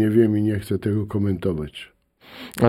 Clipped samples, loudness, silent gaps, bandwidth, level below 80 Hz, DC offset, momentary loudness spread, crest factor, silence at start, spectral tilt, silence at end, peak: under 0.1%; -22 LUFS; none; 15.5 kHz; -48 dBFS; under 0.1%; 21 LU; 18 dB; 0 s; -8 dB/octave; 0 s; -4 dBFS